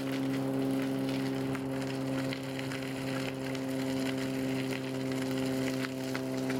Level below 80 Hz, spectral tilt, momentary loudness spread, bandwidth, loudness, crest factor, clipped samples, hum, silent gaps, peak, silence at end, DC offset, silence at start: -66 dBFS; -5.5 dB/octave; 3 LU; 16.5 kHz; -34 LUFS; 16 dB; under 0.1%; none; none; -18 dBFS; 0 s; under 0.1%; 0 s